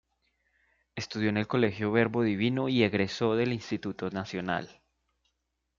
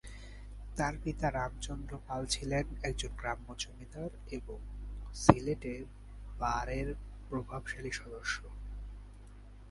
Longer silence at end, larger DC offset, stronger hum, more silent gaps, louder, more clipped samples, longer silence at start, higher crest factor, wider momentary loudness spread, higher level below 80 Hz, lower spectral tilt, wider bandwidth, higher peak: first, 1.05 s vs 0 s; neither; second, none vs 50 Hz at -45 dBFS; neither; first, -29 LUFS vs -37 LUFS; neither; first, 0.95 s vs 0.05 s; second, 20 dB vs 34 dB; second, 9 LU vs 17 LU; second, -66 dBFS vs -44 dBFS; first, -6.5 dB/octave vs -5 dB/octave; second, 7.4 kHz vs 11.5 kHz; second, -10 dBFS vs -4 dBFS